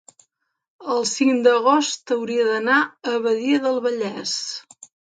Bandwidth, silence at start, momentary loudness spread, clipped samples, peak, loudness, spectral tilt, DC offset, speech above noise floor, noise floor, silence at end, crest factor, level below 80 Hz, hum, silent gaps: 9.4 kHz; 0.8 s; 9 LU; under 0.1%; -4 dBFS; -20 LUFS; -2.5 dB/octave; under 0.1%; 51 dB; -71 dBFS; 0.55 s; 18 dB; -76 dBFS; none; none